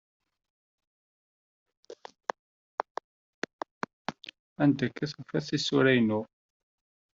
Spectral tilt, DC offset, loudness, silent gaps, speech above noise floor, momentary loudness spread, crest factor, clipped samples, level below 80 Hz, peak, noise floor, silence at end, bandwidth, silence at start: -4.5 dB/octave; under 0.1%; -30 LUFS; 2.39-2.78 s, 2.91-2.95 s, 3.04-3.42 s, 3.53-3.59 s, 3.71-3.81 s, 3.93-4.05 s, 4.39-4.56 s; over 63 dB; 22 LU; 22 dB; under 0.1%; -70 dBFS; -10 dBFS; under -90 dBFS; 0.9 s; 7.8 kHz; 1.9 s